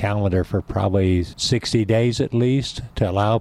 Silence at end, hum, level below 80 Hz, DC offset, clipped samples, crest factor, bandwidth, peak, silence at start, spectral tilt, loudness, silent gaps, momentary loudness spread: 0 s; none; -40 dBFS; under 0.1%; under 0.1%; 14 dB; 12 kHz; -6 dBFS; 0 s; -6 dB/octave; -21 LUFS; none; 4 LU